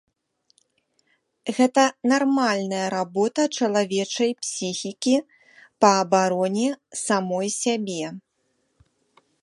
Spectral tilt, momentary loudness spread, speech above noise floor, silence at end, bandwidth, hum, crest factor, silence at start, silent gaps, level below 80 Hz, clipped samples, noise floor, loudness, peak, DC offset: -4 dB/octave; 10 LU; 49 dB; 1.25 s; 11.5 kHz; none; 22 dB; 1.45 s; none; -74 dBFS; under 0.1%; -71 dBFS; -22 LUFS; -2 dBFS; under 0.1%